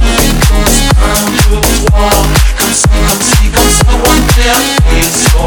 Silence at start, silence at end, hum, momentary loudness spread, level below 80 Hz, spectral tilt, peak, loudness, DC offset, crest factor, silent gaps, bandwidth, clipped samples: 0 s; 0 s; none; 2 LU; -10 dBFS; -3.5 dB/octave; 0 dBFS; -8 LUFS; under 0.1%; 6 dB; none; over 20 kHz; 0.3%